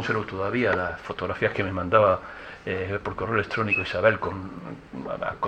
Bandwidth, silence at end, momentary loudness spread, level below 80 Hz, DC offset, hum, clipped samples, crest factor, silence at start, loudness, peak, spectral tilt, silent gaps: 8.8 kHz; 0 s; 16 LU; -54 dBFS; under 0.1%; none; under 0.1%; 22 dB; 0 s; -25 LUFS; -4 dBFS; -7 dB/octave; none